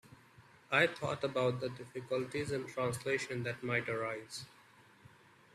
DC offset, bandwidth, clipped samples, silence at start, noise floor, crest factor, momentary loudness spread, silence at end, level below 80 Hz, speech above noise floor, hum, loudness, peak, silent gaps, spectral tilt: under 0.1%; 14.5 kHz; under 0.1%; 0.05 s; -62 dBFS; 24 dB; 13 LU; 0.45 s; -72 dBFS; 26 dB; none; -36 LUFS; -14 dBFS; none; -5 dB/octave